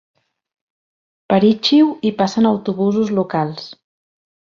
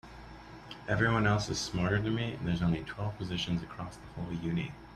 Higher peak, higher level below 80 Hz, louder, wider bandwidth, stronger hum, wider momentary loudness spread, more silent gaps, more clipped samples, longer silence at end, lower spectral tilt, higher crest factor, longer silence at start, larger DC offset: first, 0 dBFS vs -14 dBFS; second, -60 dBFS vs -52 dBFS; first, -16 LUFS vs -32 LUFS; second, 7.4 kHz vs 12 kHz; neither; second, 10 LU vs 17 LU; neither; neither; first, 0.7 s vs 0 s; about the same, -6.5 dB/octave vs -5.5 dB/octave; about the same, 18 dB vs 20 dB; first, 1.3 s vs 0.05 s; neither